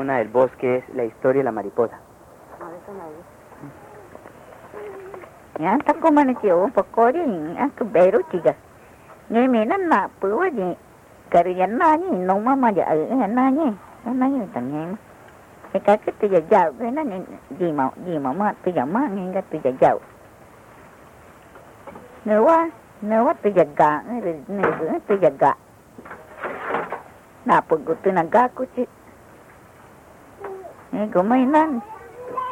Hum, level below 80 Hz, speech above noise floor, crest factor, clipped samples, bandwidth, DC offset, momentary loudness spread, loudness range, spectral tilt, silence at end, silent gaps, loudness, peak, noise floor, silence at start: none; -60 dBFS; 27 dB; 16 dB; under 0.1%; 16 kHz; under 0.1%; 20 LU; 6 LU; -8 dB/octave; 0 s; none; -20 LUFS; -6 dBFS; -47 dBFS; 0 s